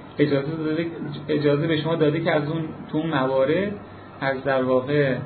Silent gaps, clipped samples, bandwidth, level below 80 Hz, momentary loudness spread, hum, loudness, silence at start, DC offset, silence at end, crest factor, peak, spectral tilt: none; under 0.1%; 4.5 kHz; -60 dBFS; 9 LU; none; -23 LUFS; 0 s; under 0.1%; 0 s; 18 dB; -6 dBFS; -11 dB/octave